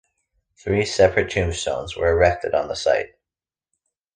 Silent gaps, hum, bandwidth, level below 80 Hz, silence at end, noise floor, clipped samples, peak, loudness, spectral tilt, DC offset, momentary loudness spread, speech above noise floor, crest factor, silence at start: none; none; 9.8 kHz; -38 dBFS; 1.1 s; under -90 dBFS; under 0.1%; -2 dBFS; -21 LUFS; -4.5 dB/octave; under 0.1%; 8 LU; over 70 dB; 20 dB; 0.65 s